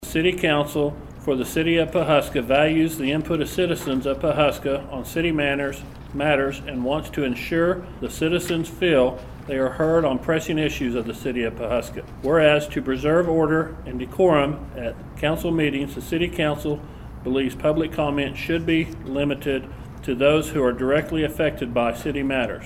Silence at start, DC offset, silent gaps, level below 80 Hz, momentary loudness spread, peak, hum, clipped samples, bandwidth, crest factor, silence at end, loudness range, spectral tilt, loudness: 0 s; under 0.1%; none; -40 dBFS; 10 LU; -4 dBFS; none; under 0.1%; 16 kHz; 18 dB; 0 s; 3 LU; -6 dB/octave; -22 LUFS